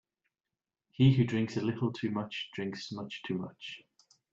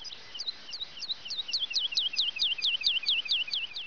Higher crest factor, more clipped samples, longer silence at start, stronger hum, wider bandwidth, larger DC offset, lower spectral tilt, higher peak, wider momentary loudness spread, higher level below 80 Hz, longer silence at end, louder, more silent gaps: about the same, 20 dB vs 16 dB; neither; first, 1 s vs 0 s; neither; first, 7.6 kHz vs 5.4 kHz; second, under 0.1% vs 0.4%; first, -7.5 dB/octave vs 2 dB/octave; about the same, -14 dBFS vs -16 dBFS; first, 19 LU vs 10 LU; first, -66 dBFS vs -72 dBFS; first, 0.55 s vs 0 s; second, -32 LUFS vs -28 LUFS; neither